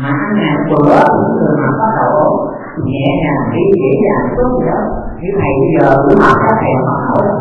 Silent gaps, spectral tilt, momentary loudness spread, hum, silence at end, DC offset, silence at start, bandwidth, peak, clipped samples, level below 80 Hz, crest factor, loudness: none; -9 dB/octave; 9 LU; none; 0 s; under 0.1%; 0 s; 7.6 kHz; 0 dBFS; 0.2%; -32 dBFS; 10 dB; -11 LUFS